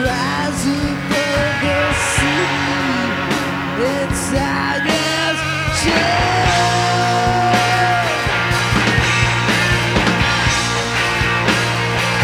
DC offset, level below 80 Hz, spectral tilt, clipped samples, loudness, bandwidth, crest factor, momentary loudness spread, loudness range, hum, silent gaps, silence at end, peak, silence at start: under 0.1%; -32 dBFS; -4 dB/octave; under 0.1%; -16 LUFS; 16.5 kHz; 14 dB; 4 LU; 3 LU; none; none; 0 s; -2 dBFS; 0 s